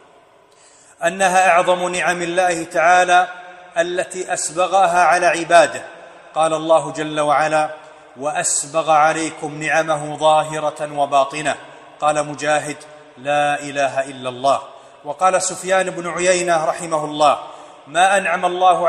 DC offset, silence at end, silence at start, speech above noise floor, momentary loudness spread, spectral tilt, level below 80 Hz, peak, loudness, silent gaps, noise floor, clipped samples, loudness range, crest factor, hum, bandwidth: under 0.1%; 0 s; 1 s; 33 dB; 12 LU; -3 dB/octave; -62 dBFS; 0 dBFS; -17 LUFS; none; -50 dBFS; under 0.1%; 4 LU; 18 dB; none; 13 kHz